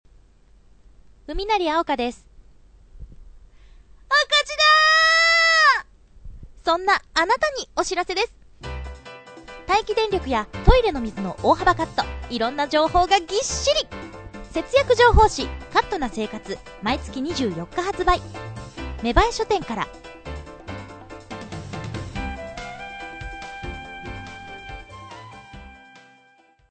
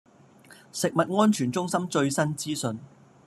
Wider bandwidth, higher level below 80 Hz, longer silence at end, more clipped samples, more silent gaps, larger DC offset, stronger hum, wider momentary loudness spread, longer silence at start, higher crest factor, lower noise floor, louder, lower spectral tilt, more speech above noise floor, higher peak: second, 9.2 kHz vs 13.5 kHz; first, -34 dBFS vs -70 dBFS; first, 0.95 s vs 0.4 s; neither; neither; neither; neither; first, 22 LU vs 10 LU; first, 1.3 s vs 0.5 s; about the same, 22 dB vs 20 dB; first, -57 dBFS vs -53 dBFS; first, -20 LUFS vs -26 LUFS; second, -3.5 dB/octave vs -5 dB/octave; first, 36 dB vs 28 dB; first, 0 dBFS vs -8 dBFS